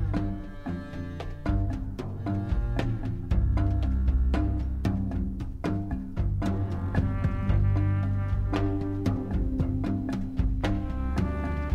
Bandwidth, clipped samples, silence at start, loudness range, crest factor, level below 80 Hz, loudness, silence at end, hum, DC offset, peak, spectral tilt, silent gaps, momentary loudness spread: 7 kHz; under 0.1%; 0 s; 2 LU; 16 dB; -30 dBFS; -29 LUFS; 0 s; none; under 0.1%; -12 dBFS; -8.5 dB/octave; none; 8 LU